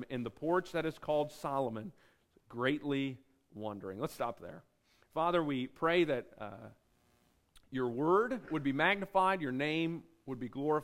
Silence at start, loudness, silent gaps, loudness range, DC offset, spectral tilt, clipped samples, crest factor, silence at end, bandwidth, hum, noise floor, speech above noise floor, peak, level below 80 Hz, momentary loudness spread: 0 s; -35 LUFS; none; 5 LU; under 0.1%; -6.5 dB/octave; under 0.1%; 20 dB; 0 s; 16 kHz; none; -72 dBFS; 37 dB; -14 dBFS; -66 dBFS; 17 LU